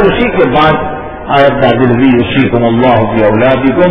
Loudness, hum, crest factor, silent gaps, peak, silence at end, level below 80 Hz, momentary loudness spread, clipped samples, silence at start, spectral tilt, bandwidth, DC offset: -8 LUFS; none; 8 dB; none; 0 dBFS; 0 s; -28 dBFS; 4 LU; 0.9%; 0 s; -9.5 dB/octave; 5.4 kHz; under 0.1%